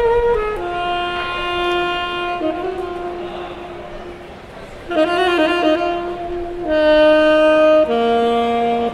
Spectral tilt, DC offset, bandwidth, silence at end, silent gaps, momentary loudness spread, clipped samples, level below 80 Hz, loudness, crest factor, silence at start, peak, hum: -5 dB/octave; under 0.1%; 11.5 kHz; 0 s; none; 19 LU; under 0.1%; -38 dBFS; -17 LUFS; 14 dB; 0 s; -2 dBFS; none